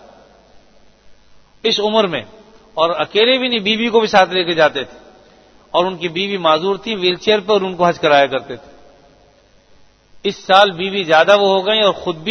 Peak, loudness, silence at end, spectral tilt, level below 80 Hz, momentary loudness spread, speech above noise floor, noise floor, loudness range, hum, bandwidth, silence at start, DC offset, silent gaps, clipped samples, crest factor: 0 dBFS; -15 LUFS; 0 s; -4.5 dB/octave; -56 dBFS; 12 LU; 36 dB; -51 dBFS; 3 LU; none; 8 kHz; 1.05 s; under 0.1%; none; under 0.1%; 16 dB